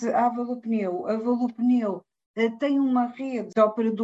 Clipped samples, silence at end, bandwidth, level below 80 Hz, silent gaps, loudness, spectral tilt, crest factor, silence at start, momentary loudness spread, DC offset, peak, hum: under 0.1%; 0 s; 7.8 kHz; -74 dBFS; 2.26-2.34 s; -25 LUFS; -7 dB/octave; 18 dB; 0 s; 8 LU; under 0.1%; -8 dBFS; none